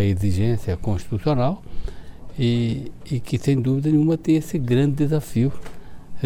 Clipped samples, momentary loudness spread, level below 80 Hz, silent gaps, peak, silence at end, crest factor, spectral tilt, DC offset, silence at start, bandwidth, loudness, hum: under 0.1%; 16 LU; -38 dBFS; none; -8 dBFS; 0 s; 14 dB; -8 dB/octave; under 0.1%; 0 s; 16 kHz; -22 LUFS; none